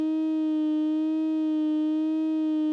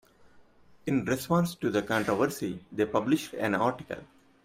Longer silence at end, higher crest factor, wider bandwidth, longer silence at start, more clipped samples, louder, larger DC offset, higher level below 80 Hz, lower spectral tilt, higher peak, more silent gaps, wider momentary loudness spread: second, 0 s vs 0.4 s; second, 4 dB vs 18 dB; second, 4.9 kHz vs 16 kHz; second, 0 s vs 0.35 s; neither; first, -26 LUFS vs -29 LUFS; neither; second, under -90 dBFS vs -62 dBFS; about the same, -6 dB/octave vs -6 dB/octave; second, -20 dBFS vs -12 dBFS; neither; second, 1 LU vs 11 LU